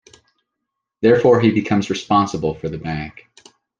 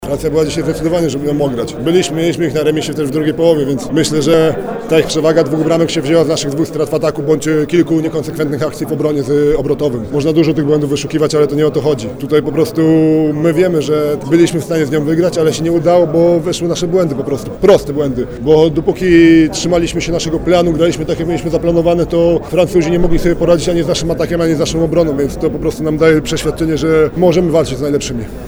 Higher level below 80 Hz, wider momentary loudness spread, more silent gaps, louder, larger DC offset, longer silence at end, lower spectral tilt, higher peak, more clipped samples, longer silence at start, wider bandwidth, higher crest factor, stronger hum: second, -50 dBFS vs -32 dBFS; first, 14 LU vs 6 LU; neither; second, -18 LUFS vs -13 LUFS; neither; first, 0.7 s vs 0 s; about the same, -6.5 dB/octave vs -6 dB/octave; about the same, -2 dBFS vs 0 dBFS; neither; first, 1 s vs 0 s; second, 9 kHz vs over 20 kHz; first, 18 dB vs 12 dB; neither